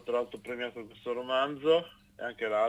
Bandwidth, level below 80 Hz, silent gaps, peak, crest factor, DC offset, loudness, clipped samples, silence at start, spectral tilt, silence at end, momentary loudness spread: 11 kHz; -70 dBFS; none; -14 dBFS; 18 dB; under 0.1%; -32 LUFS; under 0.1%; 0.05 s; -5 dB/octave; 0 s; 13 LU